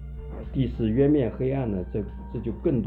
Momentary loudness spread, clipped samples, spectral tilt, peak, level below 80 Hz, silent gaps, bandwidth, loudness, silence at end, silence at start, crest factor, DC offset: 13 LU; under 0.1%; -11.5 dB/octave; -10 dBFS; -38 dBFS; none; 4.3 kHz; -26 LUFS; 0 s; 0 s; 14 dB; under 0.1%